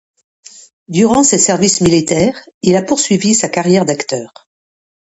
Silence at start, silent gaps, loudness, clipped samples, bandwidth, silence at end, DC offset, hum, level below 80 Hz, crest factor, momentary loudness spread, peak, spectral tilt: 0.9 s; 2.54-2.61 s; -12 LUFS; under 0.1%; 11 kHz; 0.8 s; under 0.1%; none; -46 dBFS; 14 dB; 9 LU; 0 dBFS; -4 dB/octave